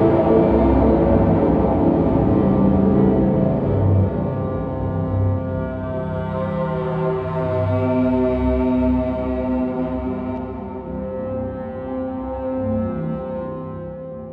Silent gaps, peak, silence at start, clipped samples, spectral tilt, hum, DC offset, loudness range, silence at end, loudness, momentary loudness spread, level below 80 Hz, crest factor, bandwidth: none; -4 dBFS; 0 s; under 0.1%; -11.5 dB/octave; none; under 0.1%; 9 LU; 0 s; -20 LUFS; 12 LU; -32 dBFS; 16 dB; 4.8 kHz